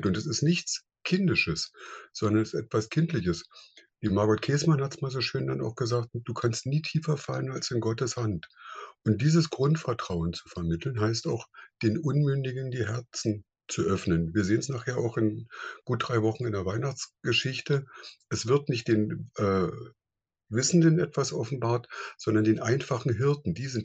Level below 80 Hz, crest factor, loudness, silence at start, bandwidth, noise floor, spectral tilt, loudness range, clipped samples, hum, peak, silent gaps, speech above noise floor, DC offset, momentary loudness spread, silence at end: -56 dBFS; 18 dB; -28 LUFS; 0 s; 8.6 kHz; -90 dBFS; -5.5 dB/octave; 3 LU; under 0.1%; none; -10 dBFS; none; 62 dB; under 0.1%; 10 LU; 0 s